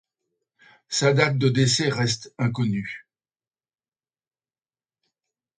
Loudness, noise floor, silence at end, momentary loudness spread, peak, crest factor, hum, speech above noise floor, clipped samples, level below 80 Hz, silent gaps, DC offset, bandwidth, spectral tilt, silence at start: -22 LUFS; under -90 dBFS; 2.6 s; 10 LU; -6 dBFS; 20 dB; none; over 68 dB; under 0.1%; -62 dBFS; none; under 0.1%; 9.6 kHz; -4.5 dB/octave; 0.9 s